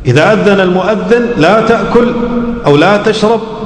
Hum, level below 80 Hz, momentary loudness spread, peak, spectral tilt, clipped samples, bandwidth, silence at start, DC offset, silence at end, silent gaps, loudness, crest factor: none; -32 dBFS; 5 LU; 0 dBFS; -6.5 dB/octave; 2%; 11 kHz; 0 s; under 0.1%; 0 s; none; -9 LUFS; 8 dB